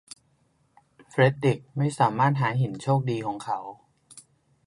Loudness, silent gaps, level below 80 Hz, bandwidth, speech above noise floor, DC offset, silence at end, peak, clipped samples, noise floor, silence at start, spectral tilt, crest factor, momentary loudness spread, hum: -25 LUFS; none; -66 dBFS; 11.5 kHz; 43 dB; under 0.1%; 0.45 s; -6 dBFS; under 0.1%; -67 dBFS; 1.15 s; -7 dB/octave; 20 dB; 11 LU; none